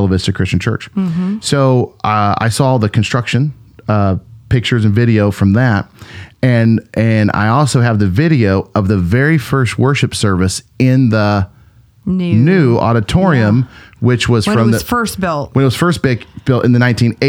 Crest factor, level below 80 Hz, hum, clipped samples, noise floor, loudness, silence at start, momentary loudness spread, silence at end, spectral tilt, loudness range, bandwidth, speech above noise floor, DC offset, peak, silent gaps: 12 dB; -38 dBFS; none; under 0.1%; -45 dBFS; -13 LUFS; 0 s; 7 LU; 0 s; -6.5 dB/octave; 2 LU; 16.5 kHz; 33 dB; under 0.1%; 0 dBFS; none